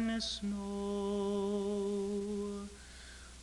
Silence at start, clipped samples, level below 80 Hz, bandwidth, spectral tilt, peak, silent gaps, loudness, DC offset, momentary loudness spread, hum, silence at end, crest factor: 0 s; under 0.1%; -56 dBFS; 12 kHz; -5 dB/octave; -24 dBFS; none; -37 LUFS; under 0.1%; 16 LU; none; 0 s; 12 dB